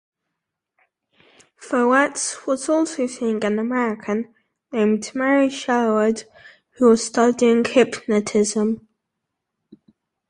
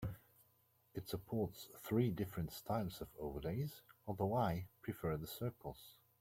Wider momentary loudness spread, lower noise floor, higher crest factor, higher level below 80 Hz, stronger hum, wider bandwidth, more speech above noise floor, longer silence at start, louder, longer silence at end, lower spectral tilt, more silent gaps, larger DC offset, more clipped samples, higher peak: second, 9 LU vs 15 LU; first, -81 dBFS vs -75 dBFS; about the same, 18 dB vs 20 dB; about the same, -64 dBFS vs -62 dBFS; neither; second, 11 kHz vs 16.5 kHz; first, 62 dB vs 33 dB; first, 1.6 s vs 0 s; first, -20 LUFS vs -43 LUFS; first, 1.5 s vs 0.3 s; second, -4 dB/octave vs -7 dB/octave; neither; neither; neither; first, -2 dBFS vs -24 dBFS